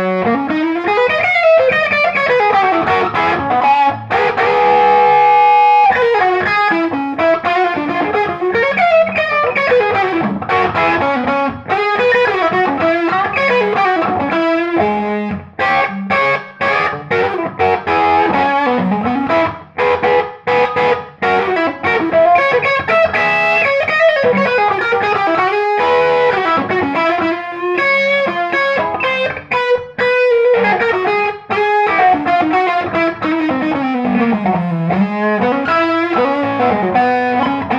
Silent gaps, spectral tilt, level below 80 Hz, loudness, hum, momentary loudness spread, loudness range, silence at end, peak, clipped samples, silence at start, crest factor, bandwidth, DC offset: none; -6.5 dB/octave; -50 dBFS; -13 LUFS; none; 6 LU; 4 LU; 0 s; 0 dBFS; under 0.1%; 0 s; 14 dB; 7.8 kHz; under 0.1%